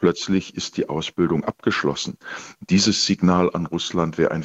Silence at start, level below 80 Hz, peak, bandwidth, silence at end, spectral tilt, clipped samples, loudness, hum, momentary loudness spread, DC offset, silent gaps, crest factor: 0 s; -54 dBFS; -4 dBFS; 8.2 kHz; 0 s; -4.5 dB/octave; under 0.1%; -21 LUFS; none; 10 LU; under 0.1%; none; 18 dB